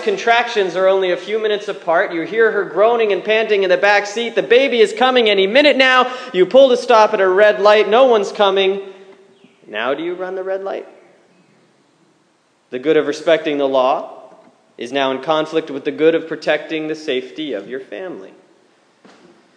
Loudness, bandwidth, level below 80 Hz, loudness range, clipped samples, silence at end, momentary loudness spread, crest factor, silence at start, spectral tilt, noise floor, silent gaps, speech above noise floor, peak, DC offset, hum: -15 LUFS; 10 kHz; -72 dBFS; 12 LU; under 0.1%; 1.3 s; 14 LU; 16 dB; 0 s; -4 dB/octave; -58 dBFS; none; 43 dB; 0 dBFS; under 0.1%; none